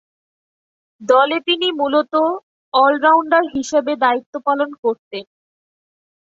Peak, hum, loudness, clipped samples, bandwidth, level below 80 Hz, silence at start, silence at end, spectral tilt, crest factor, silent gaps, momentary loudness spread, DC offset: -2 dBFS; none; -17 LUFS; under 0.1%; 8 kHz; -64 dBFS; 1 s; 1.05 s; -2.5 dB/octave; 16 dB; 2.43-2.72 s, 4.26-4.33 s, 4.78-4.83 s, 4.99-5.11 s; 12 LU; under 0.1%